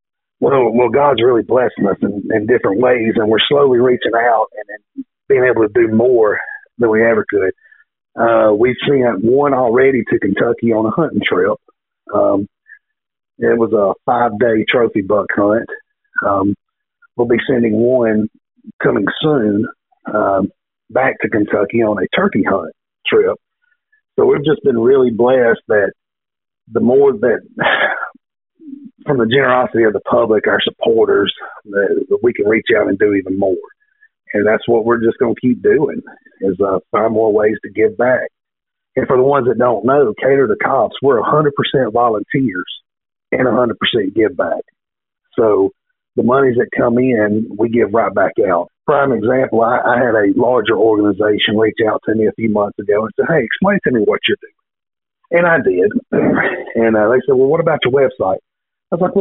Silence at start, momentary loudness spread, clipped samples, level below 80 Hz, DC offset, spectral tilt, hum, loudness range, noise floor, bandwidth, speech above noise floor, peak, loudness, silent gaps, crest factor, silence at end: 0.4 s; 8 LU; under 0.1%; -52 dBFS; under 0.1%; -4 dB/octave; none; 3 LU; -83 dBFS; 4 kHz; 69 dB; 0 dBFS; -14 LUFS; 18.73-18.79 s; 14 dB; 0 s